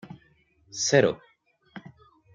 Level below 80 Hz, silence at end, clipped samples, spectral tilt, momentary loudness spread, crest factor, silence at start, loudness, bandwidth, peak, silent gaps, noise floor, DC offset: -66 dBFS; 0.45 s; under 0.1%; -3.5 dB/octave; 26 LU; 24 dB; 0.05 s; -23 LUFS; 9.4 kHz; -4 dBFS; none; -65 dBFS; under 0.1%